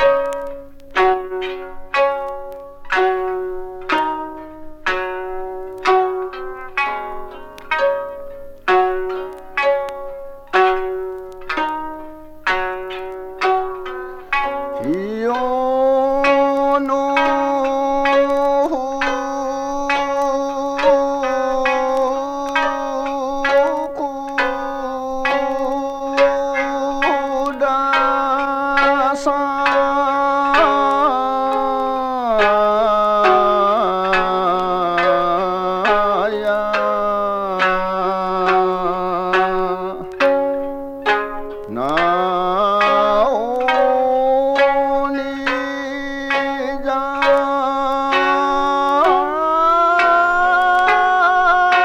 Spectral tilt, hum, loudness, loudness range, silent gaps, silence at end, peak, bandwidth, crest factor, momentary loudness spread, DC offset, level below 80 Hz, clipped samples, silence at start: -4.5 dB/octave; none; -17 LUFS; 6 LU; none; 0 s; -2 dBFS; 14.5 kHz; 16 dB; 12 LU; under 0.1%; -42 dBFS; under 0.1%; 0 s